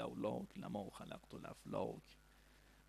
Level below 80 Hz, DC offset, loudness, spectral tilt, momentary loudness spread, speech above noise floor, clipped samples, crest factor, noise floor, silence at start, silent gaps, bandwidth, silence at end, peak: -70 dBFS; under 0.1%; -48 LUFS; -6.5 dB/octave; 23 LU; 20 dB; under 0.1%; 20 dB; -67 dBFS; 0 s; none; 14 kHz; 0 s; -28 dBFS